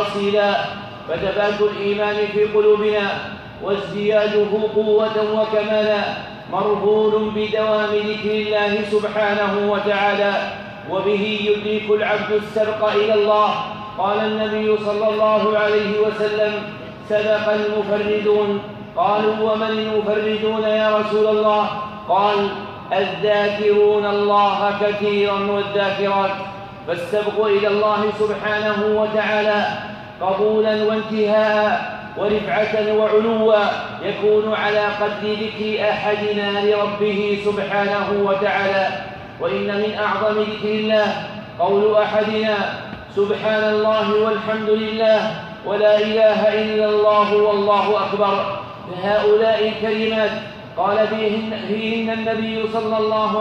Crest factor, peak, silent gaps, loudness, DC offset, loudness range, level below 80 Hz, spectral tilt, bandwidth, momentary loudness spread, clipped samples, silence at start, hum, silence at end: 14 dB; -4 dBFS; none; -19 LUFS; under 0.1%; 2 LU; -54 dBFS; -6 dB/octave; 7 kHz; 8 LU; under 0.1%; 0 s; none; 0 s